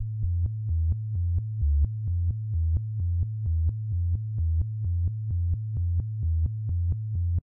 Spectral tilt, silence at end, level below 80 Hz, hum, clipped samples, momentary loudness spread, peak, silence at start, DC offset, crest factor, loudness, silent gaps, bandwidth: -16 dB/octave; 0.05 s; -32 dBFS; none; under 0.1%; 2 LU; -16 dBFS; 0 s; under 0.1%; 10 dB; -29 LUFS; none; 0.7 kHz